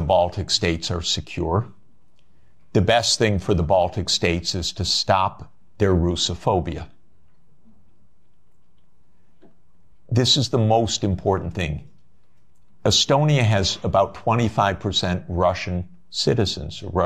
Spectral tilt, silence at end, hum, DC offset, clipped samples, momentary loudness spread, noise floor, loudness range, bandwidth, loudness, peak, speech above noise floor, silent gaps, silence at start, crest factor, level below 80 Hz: -4.5 dB/octave; 0 s; none; 0.7%; under 0.1%; 9 LU; -64 dBFS; 5 LU; 13 kHz; -21 LUFS; -4 dBFS; 44 dB; none; 0 s; 18 dB; -40 dBFS